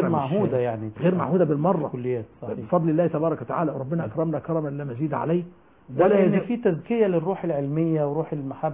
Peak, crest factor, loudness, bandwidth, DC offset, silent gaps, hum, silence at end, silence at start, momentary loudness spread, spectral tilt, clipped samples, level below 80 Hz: -6 dBFS; 16 dB; -24 LUFS; 3.8 kHz; under 0.1%; none; none; 0 s; 0 s; 8 LU; -12.5 dB/octave; under 0.1%; -60 dBFS